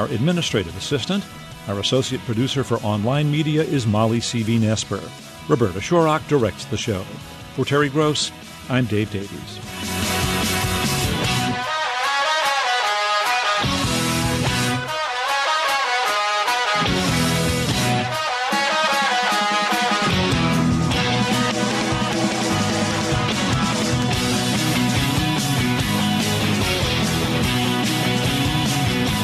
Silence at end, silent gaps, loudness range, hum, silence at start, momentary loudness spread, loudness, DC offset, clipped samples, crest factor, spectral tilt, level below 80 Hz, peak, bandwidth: 0 s; none; 3 LU; none; 0 s; 6 LU; -20 LUFS; under 0.1%; under 0.1%; 16 dB; -4 dB/octave; -40 dBFS; -4 dBFS; 13.5 kHz